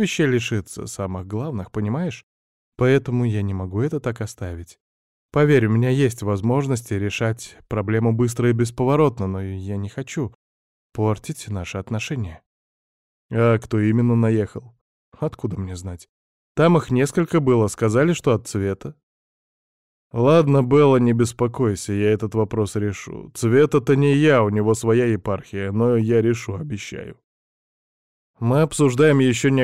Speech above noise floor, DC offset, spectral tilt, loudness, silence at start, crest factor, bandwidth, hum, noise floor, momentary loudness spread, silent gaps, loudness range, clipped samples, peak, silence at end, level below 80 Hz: over 70 dB; under 0.1%; -7 dB/octave; -20 LUFS; 0 s; 16 dB; 13.5 kHz; none; under -90 dBFS; 14 LU; 2.23-2.72 s, 4.80-5.29 s, 10.35-10.90 s, 12.46-13.29 s, 14.81-15.12 s, 16.09-16.55 s, 19.03-20.11 s, 27.24-28.34 s; 5 LU; under 0.1%; -6 dBFS; 0 s; -52 dBFS